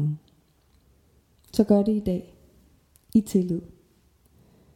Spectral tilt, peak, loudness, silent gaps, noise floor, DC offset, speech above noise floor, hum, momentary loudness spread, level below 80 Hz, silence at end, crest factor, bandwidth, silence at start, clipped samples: -8 dB/octave; -6 dBFS; -25 LUFS; none; -62 dBFS; under 0.1%; 40 dB; none; 12 LU; -54 dBFS; 1.1 s; 22 dB; 16.5 kHz; 0 s; under 0.1%